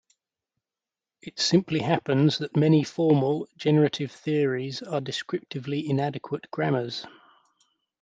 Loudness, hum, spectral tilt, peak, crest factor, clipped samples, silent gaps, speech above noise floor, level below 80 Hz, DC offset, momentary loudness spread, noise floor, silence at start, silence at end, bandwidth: -25 LUFS; none; -6 dB/octave; -6 dBFS; 20 dB; under 0.1%; none; over 65 dB; -70 dBFS; under 0.1%; 12 LU; under -90 dBFS; 1.25 s; 0.95 s; 8 kHz